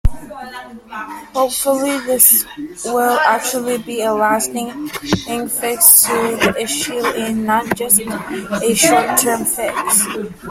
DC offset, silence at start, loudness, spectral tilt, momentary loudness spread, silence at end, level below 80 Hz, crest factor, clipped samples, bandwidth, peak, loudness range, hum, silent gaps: under 0.1%; 0.05 s; -14 LUFS; -2.5 dB/octave; 17 LU; 0 s; -34 dBFS; 16 dB; under 0.1%; 16.5 kHz; 0 dBFS; 2 LU; none; none